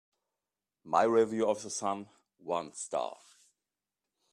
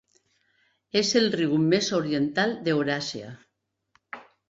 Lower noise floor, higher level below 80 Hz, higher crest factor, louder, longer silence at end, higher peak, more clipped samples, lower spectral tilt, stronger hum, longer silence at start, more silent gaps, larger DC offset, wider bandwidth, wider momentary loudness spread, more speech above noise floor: first, under -90 dBFS vs -69 dBFS; second, -80 dBFS vs -66 dBFS; about the same, 22 dB vs 18 dB; second, -32 LUFS vs -24 LUFS; first, 1.2 s vs 0.3 s; second, -12 dBFS vs -8 dBFS; neither; about the same, -4 dB/octave vs -4.5 dB/octave; neither; about the same, 0.85 s vs 0.95 s; neither; neither; first, 11 kHz vs 7.8 kHz; second, 13 LU vs 21 LU; first, over 59 dB vs 44 dB